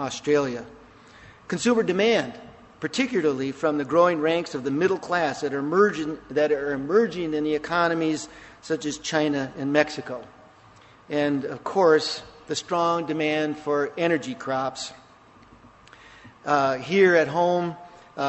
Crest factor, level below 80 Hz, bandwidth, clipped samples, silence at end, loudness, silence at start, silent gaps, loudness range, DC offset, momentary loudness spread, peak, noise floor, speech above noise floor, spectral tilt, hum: 22 dB; -62 dBFS; 8.4 kHz; under 0.1%; 0 s; -24 LUFS; 0 s; none; 4 LU; under 0.1%; 13 LU; -4 dBFS; -52 dBFS; 29 dB; -5 dB/octave; none